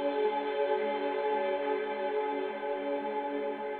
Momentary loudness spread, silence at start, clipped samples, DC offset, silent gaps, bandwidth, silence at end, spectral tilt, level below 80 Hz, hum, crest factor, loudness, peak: 4 LU; 0 s; under 0.1%; under 0.1%; none; 4.4 kHz; 0 s; -6.5 dB/octave; -80 dBFS; none; 14 dB; -32 LUFS; -18 dBFS